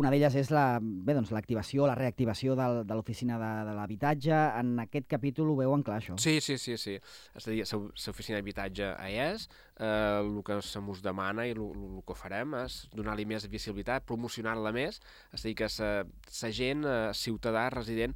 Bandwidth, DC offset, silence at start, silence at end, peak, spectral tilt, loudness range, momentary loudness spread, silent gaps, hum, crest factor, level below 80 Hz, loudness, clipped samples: 16.5 kHz; under 0.1%; 0 s; 0 s; -14 dBFS; -5.5 dB/octave; 6 LU; 11 LU; none; none; 18 dB; -54 dBFS; -33 LUFS; under 0.1%